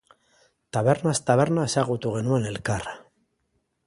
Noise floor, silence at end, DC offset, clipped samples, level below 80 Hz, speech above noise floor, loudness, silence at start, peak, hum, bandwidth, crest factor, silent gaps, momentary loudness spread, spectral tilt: -73 dBFS; 0.85 s; under 0.1%; under 0.1%; -54 dBFS; 50 dB; -24 LUFS; 0.75 s; -6 dBFS; none; 11.5 kHz; 20 dB; none; 10 LU; -5.5 dB/octave